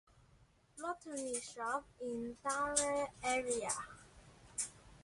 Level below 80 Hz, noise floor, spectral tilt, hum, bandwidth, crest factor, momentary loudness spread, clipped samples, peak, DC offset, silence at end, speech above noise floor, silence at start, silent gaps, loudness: -68 dBFS; -68 dBFS; -2 dB/octave; none; 11.5 kHz; 24 dB; 12 LU; under 0.1%; -18 dBFS; under 0.1%; 0 s; 29 dB; 0.75 s; none; -39 LUFS